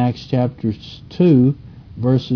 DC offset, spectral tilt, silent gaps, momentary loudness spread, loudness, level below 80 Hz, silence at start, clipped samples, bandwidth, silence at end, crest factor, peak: under 0.1%; -9.5 dB/octave; none; 19 LU; -17 LUFS; -46 dBFS; 0 s; under 0.1%; 5.4 kHz; 0 s; 14 dB; -2 dBFS